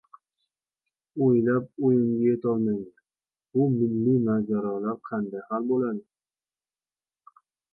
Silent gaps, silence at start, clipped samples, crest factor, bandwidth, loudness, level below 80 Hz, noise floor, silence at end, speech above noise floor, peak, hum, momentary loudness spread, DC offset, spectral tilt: none; 1.15 s; under 0.1%; 14 dB; 2.7 kHz; -25 LUFS; -68 dBFS; under -90 dBFS; 1.7 s; over 66 dB; -12 dBFS; none; 9 LU; under 0.1%; -13.5 dB/octave